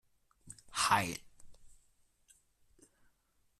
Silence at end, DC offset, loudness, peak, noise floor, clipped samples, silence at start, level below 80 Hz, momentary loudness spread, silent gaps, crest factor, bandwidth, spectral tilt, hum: 1.9 s; under 0.1%; -33 LUFS; -14 dBFS; -75 dBFS; under 0.1%; 0.45 s; -68 dBFS; 24 LU; none; 26 dB; 14 kHz; -2 dB/octave; none